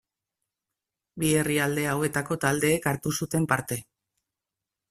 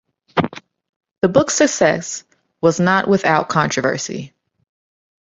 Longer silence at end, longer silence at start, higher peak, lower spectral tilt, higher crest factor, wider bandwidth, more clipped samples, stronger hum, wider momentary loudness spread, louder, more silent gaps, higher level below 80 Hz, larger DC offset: about the same, 1.1 s vs 1.1 s; first, 1.15 s vs 0.35 s; second, -6 dBFS vs -2 dBFS; about the same, -4.5 dB/octave vs -4.5 dB/octave; about the same, 22 dB vs 18 dB; first, 15.5 kHz vs 8 kHz; neither; neither; second, 6 LU vs 13 LU; second, -26 LUFS vs -17 LUFS; second, none vs 0.89-1.00 s, 1.11-1.22 s; about the same, -58 dBFS vs -54 dBFS; neither